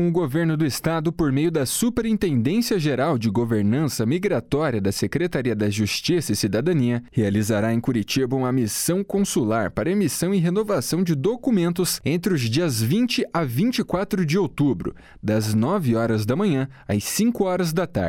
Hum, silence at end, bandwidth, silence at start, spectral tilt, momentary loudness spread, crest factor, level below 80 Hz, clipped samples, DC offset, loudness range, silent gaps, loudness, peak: none; 0 s; 18 kHz; 0 s; -5.5 dB/octave; 2 LU; 14 dB; -48 dBFS; under 0.1%; under 0.1%; 1 LU; none; -22 LUFS; -8 dBFS